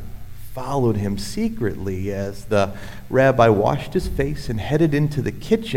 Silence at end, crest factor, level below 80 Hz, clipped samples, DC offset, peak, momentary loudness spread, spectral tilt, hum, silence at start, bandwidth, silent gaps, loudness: 0 s; 18 dB; -36 dBFS; under 0.1%; under 0.1%; -2 dBFS; 12 LU; -7 dB/octave; none; 0 s; 16.5 kHz; none; -21 LUFS